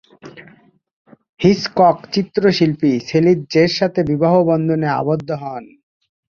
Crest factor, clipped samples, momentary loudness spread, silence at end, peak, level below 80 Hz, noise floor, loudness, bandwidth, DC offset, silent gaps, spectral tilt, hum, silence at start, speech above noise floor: 16 dB; under 0.1%; 7 LU; 0.75 s; 0 dBFS; -52 dBFS; -50 dBFS; -16 LUFS; 7.2 kHz; under 0.1%; 0.93-1.05 s, 1.29-1.37 s; -7 dB/octave; none; 0.25 s; 34 dB